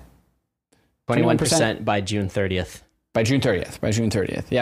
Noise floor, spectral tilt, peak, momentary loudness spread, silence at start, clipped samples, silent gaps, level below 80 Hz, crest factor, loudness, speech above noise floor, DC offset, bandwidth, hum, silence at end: -69 dBFS; -5 dB/octave; -6 dBFS; 8 LU; 0 s; under 0.1%; none; -48 dBFS; 18 dB; -22 LUFS; 48 dB; under 0.1%; 15.5 kHz; none; 0 s